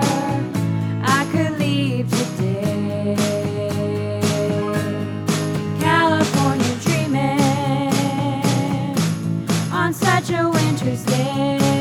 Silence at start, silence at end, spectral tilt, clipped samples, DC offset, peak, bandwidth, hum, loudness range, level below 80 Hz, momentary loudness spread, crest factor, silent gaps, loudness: 0 s; 0 s; -5.5 dB/octave; under 0.1%; under 0.1%; -2 dBFS; 17.5 kHz; none; 3 LU; -54 dBFS; 5 LU; 18 dB; none; -20 LUFS